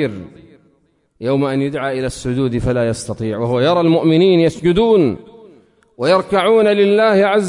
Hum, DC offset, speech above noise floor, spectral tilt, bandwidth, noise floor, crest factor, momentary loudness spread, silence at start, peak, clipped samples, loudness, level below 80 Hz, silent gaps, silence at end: none; under 0.1%; 45 dB; -6.5 dB/octave; 11 kHz; -59 dBFS; 12 dB; 10 LU; 0 s; -2 dBFS; under 0.1%; -15 LUFS; -42 dBFS; none; 0 s